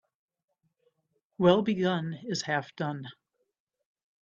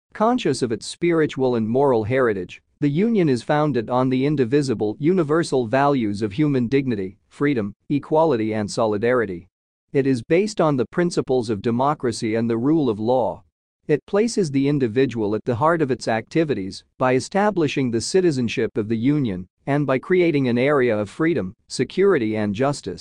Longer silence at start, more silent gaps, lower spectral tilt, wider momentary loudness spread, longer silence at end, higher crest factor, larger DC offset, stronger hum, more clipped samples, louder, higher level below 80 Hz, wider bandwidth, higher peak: first, 1.4 s vs 0.15 s; second, none vs 7.76-7.80 s, 9.52-9.88 s, 13.52-13.80 s, 14.03-14.07 s, 19.50-19.57 s; about the same, -5.5 dB/octave vs -6.5 dB/octave; first, 12 LU vs 7 LU; first, 1.1 s vs 0 s; first, 24 dB vs 16 dB; second, under 0.1% vs 0.2%; neither; neither; second, -28 LUFS vs -21 LUFS; second, -70 dBFS vs -56 dBFS; second, 7.6 kHz vs 10.5 kHz; second, -8 dBFS vs -4 dBFS